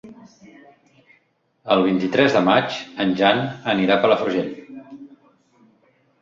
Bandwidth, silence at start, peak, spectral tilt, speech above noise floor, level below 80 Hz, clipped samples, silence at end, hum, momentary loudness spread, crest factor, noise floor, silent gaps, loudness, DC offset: 7.6 kHz; 0.05 s; -2 dBFS; -6 dB/octave; 46 dB; -60 dBFS; under 0.1%; 1.15 s; none; 22 LU; 20 dB; -64 dBFS; none; -19 LUFS; under 0.1%